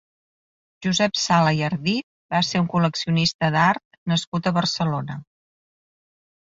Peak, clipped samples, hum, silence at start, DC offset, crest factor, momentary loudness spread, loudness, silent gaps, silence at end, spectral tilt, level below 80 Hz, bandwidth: -4 dBFS; under 0.1%; none; 0.8 s; under 0.1%; 18 dB; 9 LU; -22 LUFS; 2.03-2.29 s, 3.34-3.39 s, 3.85-3.91 s, 3.98-4.06 s, 4.27-4.32 s; 1.25 s; -5 dB/octave; -58 dBFS; 7.8 kHz